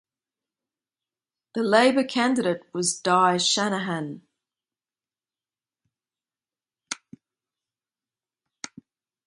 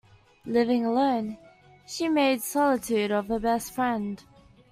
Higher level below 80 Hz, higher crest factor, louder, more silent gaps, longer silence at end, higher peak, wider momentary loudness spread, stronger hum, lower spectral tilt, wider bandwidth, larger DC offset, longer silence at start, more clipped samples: second, -76 dBFS vs -58 dBFS; first, 24 dB vs 16 dB; first, -22 LUFS vs -26 LUFS; neither; first, 2.3 s vs 0.5 s; first, -4 dBFS vs -10 dBFS; first, 21 LU vs 14 LU; neither; about the same, -3.5 dB/octave vs -4.5 dB/octave; second, 11.5 kHz vs 16 kHz; neither; first, 1.55 s vs 0.45 s; neither